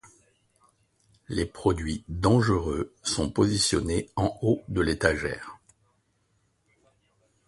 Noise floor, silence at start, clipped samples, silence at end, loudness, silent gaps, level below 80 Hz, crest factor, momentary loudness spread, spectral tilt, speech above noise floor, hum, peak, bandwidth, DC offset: -71 dBFS; 1.3 s; under 0.1%; 1.9 s; -26 LUFS; none; -42 dBFS; 24 dB; 10 LU; -5 dB/octave; 45 dB; none; -4 dBFS; 11.5 kHz; under 0.1%